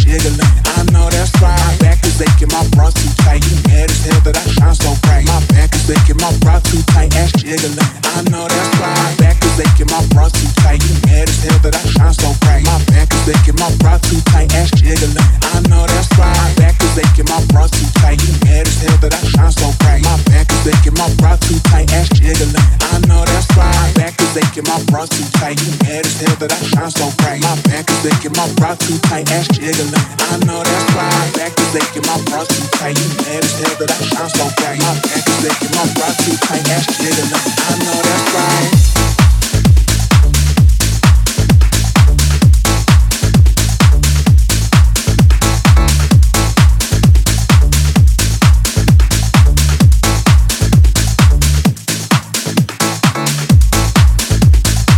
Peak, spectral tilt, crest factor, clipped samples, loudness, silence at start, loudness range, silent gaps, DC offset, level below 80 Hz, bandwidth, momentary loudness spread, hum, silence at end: 0 dBFS; -4.5 dB/octave; 10 dB; under 0.1%; -11 LUFS; 0 s; 3 LU; none; under 0.1%; -14 dBFS; 17.5 kHz; 4 LU; none; 0 s